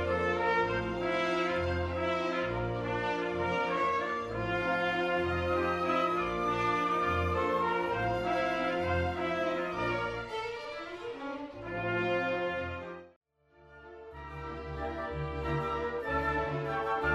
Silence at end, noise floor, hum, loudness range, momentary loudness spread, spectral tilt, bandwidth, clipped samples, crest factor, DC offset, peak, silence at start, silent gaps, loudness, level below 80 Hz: 0 s; -61 dBFS; none; 6 LU; 11 LU; -6.5 dB/octave; 12.5 kHz; under 0.1%; 16 dB; under 0.1%; -16 dBFS; 0 s; 13.16-13.21 s; -32 LUFS; -50 dBFS